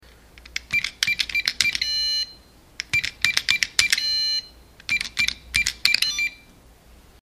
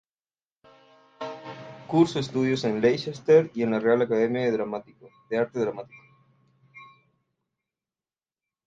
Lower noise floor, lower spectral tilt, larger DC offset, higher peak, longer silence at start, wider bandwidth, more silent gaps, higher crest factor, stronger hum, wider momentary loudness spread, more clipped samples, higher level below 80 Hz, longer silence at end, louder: second, -51 dBFS vs under -90 dBFS; second, 1 dB/octave vs -6.5 dB/octave; neither; first, 0 dBFS vs -8 dBFS; second, 0.35 s vs 1.2 s; first, 15.5 kHz vs 7.8 kHz; neither; about the same, 24 dB vs 20 dB; neither; second, 8 LU vs 19 LU; neither; first, -50 dBFS vs -68 dBFS; second, 0.85 s vs 1.85 s; first, -21 LUFS vs -24 LUFS